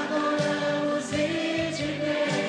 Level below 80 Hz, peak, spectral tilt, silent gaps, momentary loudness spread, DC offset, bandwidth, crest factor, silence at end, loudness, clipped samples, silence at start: -58 dBFS; -14 dBFS; -4.5 dB/octave; none; 2 LU; under 0.1%; 10 kHz; 14 dB; 0 s; -27 LUFS; under 0.1%; 0 s